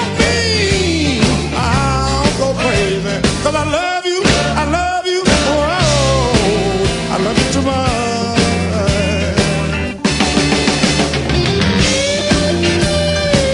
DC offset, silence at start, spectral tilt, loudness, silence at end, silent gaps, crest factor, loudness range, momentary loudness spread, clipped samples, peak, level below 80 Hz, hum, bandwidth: under 0.1%; 0 s; -4.5 dB/octave; -14 LUFS; 0 s; none; 14 dB; 1 LU; 3 LU; under 0.1%; 0 dBFS; -28 dBFS; none; 11 kHz